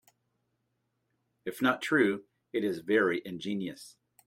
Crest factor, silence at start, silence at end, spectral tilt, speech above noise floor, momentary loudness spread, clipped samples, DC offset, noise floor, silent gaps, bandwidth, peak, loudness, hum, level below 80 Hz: 20 dB; 1.45 s; 0.35 s; -5.5 dB/octave; 50 dB; 14 LU; under 0.1%; under 0.1%; -79 dBFS; none; 16 kHz; -14 dBFS; -30 LUFS; none; -76 dBFS